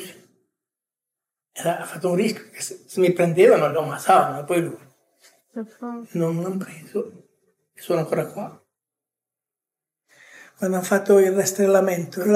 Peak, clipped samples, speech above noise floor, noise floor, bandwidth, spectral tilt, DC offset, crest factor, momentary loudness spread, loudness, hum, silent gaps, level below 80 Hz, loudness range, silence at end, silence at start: -4 dBFS; under 0.1%; 68 dB; -89 dBFS; 16 kHz; -5.5 dB/octave; under 0.1%; 20 dB; 20 LU; -21 LUFS; none; none; -80 dBFS; 11 LU; 0 s; 0 s